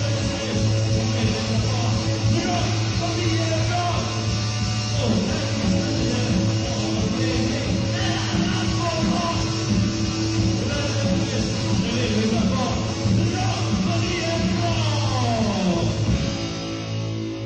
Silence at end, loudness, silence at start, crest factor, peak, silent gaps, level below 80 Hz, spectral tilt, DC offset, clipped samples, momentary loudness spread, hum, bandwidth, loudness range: 0 s; -22 LUFS; 0 s; 12 dB; -10 dBFS; none; -36 dBFS; -5 dB/octave; under 0.1%; under 0.1%; 2 LU; none; 9.6 kHz; 1 LU